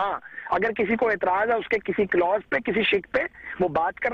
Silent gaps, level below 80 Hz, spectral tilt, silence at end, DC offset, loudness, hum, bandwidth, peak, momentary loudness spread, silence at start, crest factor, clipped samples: none; -54 dBFS; -7 dB/octave; 0 s; under 0.1%; -24 LUFS; none; 7 kHz; -12 dBFS; 6 LU; 0 s; 14 dB; under 0.1%